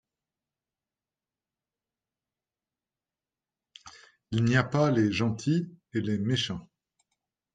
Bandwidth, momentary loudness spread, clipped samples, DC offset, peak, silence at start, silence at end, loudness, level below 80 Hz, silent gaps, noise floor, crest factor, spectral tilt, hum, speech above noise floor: 9.2 kHz; 9 LU; under 0.1%; under 0.1%; -10 dBFS; 3.85 s; 0.9 s; -28 LUFS; -62 dBFS; none; under -90 dBFS; 20 dB; -6 dB/octave; none; over 64 dB